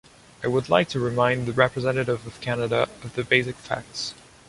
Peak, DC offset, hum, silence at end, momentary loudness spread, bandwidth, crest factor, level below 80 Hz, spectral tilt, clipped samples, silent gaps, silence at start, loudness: -2 dBFS; under 0.1%; none; 0.35 s; 10 LU; 11.5 kHz; 22 dB; -54 dBFS; -5.5 dB/octave; under 0.1%; none; 0.4 s; -24 LUFS